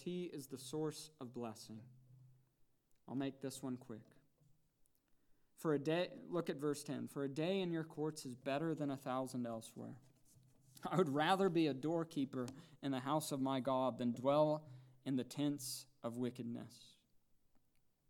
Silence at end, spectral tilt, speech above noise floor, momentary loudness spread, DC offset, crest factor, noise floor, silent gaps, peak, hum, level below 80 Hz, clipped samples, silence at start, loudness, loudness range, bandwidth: 1.2 s; -5.5 dB/octave; 36 dB; 16 LU; under 0.1%; 22 dB; -76 dBFS; none; -22 dBFS; none; -84 dBFS; under 0.1%; 0 s; -41 LUFS; 11 LU; 19 kHz